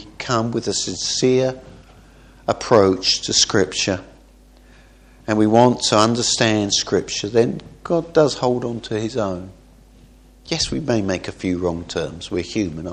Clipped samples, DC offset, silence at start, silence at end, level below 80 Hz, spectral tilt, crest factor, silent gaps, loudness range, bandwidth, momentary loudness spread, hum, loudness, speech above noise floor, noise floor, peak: under 0.1%; under 0.1%; 0 s; 0 s; -46 dBFS; -4 dB/octave; 20 dB; none; 7 LU; 10.5 kHz; 11 LU; none; -19 LUFS; 29 dB; -48 dBFS; 0 dBFS